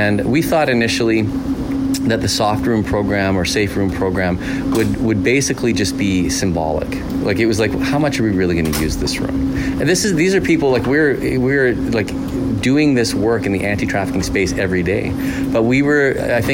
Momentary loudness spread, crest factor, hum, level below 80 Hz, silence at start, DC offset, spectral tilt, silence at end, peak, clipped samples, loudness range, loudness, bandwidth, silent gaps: 5 LU; 12 dB; none; -32 dBFS; 0 s; under 0.1%; -5 dB/octave; 0 s; -6 dBFS; under 0.1%; 2 LU; -16 LUFS; 16.5 kHz; none